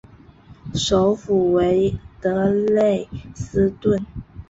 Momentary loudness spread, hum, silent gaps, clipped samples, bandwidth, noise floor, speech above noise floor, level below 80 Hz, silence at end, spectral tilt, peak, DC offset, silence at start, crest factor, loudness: 13 LU; none; none; under 0.1%; 8 kHz; -46 dBFS; 27 dB; -42 dBFS; 0.05 s; -6 dB/octave; -6 dBFS; under 0.1%; 0.5 s; 14 dB; -20 LUFS